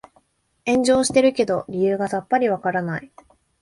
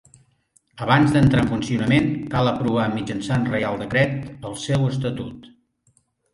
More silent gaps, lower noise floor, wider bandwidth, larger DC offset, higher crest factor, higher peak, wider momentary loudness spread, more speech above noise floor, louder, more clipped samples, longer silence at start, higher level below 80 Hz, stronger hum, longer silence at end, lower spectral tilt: neither; about the same, -62 dBFS vs -64 dBFS; about the same, 11.5 kHz vs 11.5 kHz; neither; about the same, 18 dB vs 18 dB; about the same, -4 dBFS vs -4 dBFS; second, 10 LU vs 14 LU; about the same, 42 dB vs 43 dB; about the same, -20 LUFS vs -21 LUFS; neither; about the same, 0.65 s vs 0.75 s; second, -56 dBFS vs -46 dBFS; neither; second, 0.55 s vs 0.85 s; second, -4.5 dB/octave vs -6.5 dB/octave